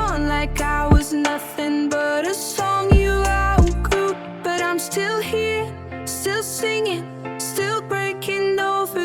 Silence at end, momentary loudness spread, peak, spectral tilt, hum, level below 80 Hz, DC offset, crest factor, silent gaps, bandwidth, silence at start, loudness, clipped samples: 0 s; 8 LU; -2 dBFS; -5 dB/octave; none; -28 dBFS; under 0.1%; 18 dB; none; 19 kHz; 0 s; -21 LUFS; under 0.1%